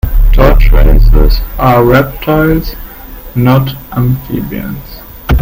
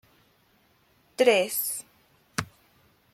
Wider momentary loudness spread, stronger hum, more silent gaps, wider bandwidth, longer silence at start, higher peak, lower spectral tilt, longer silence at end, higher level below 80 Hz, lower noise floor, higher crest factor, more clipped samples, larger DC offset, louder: second, 16 LU vs 19 LU; neither; neither; about the same, 16.5 kHz vs 16 kHz; second, 0.05 s vs 1.2 s; first, 0 dBFS vs -6 dBFS; first, -8 dB/octave vs -2.5 dB/octave; second, 0 s vs 0.7 s; first, -10 dBFS vs -64 dBFS; second, -27 dBFS vs -65 dBFS; second, 8 dB vs 24 dB; first, 1% vs under 0.1%; neither; first, -10 LUFS vs -26 LUFS